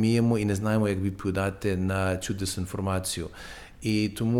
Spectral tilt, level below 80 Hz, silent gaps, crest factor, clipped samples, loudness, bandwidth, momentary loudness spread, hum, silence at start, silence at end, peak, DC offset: -6 dB/octave; -48 dBFS; none; 14 dB; under 0.1%; -28 LUFS; 16.5 kHz; 9 LU; none; 0 s; 0 s; -12 dBFS; under 0.1%